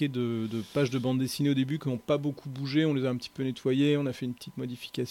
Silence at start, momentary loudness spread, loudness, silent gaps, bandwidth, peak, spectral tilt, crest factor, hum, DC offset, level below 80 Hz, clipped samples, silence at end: 0 s; 10 LU; -30 LUFS; none; 16 kHz; -14 dBFS; -6.5 dB/octave; 16 dB; none; under 0.1%; -68 dBFS; under 0.1%; 0 s